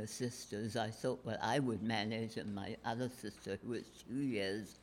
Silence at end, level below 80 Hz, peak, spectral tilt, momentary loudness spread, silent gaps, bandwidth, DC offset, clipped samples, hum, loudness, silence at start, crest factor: 0 s; -72 dBFS; -24 dBFS; -5 dB/octave; 9 LU; none; 16.5 kHz; under 0.1%; under 0.1%; none; -41 LUFS; 0 s; 16 dB